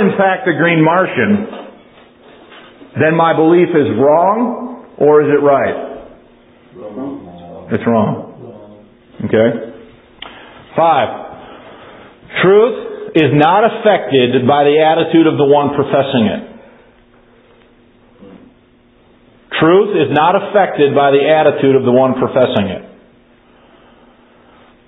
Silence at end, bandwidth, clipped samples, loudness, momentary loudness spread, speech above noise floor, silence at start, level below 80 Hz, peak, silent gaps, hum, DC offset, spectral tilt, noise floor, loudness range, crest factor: 2.05 s; 4 kHz; under 0.1%; -12 LUFS; 19 LU; 38 dB; 0 s; -52 dBFS; 0 dBFS; none; none; under 0.1%; -10 dB/octave; -49 dBFS; 8 LU; 14 dB